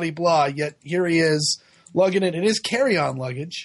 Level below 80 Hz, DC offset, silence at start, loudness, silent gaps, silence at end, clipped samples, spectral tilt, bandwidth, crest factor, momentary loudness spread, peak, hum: -64 dBFS; under 0.1%; 0 s; -21 LUFS; none; 0 s; under 0.1%; -4.5 dB/octave; 11.5 kHz; 14 dB; 9 LU; -8 dBFS; none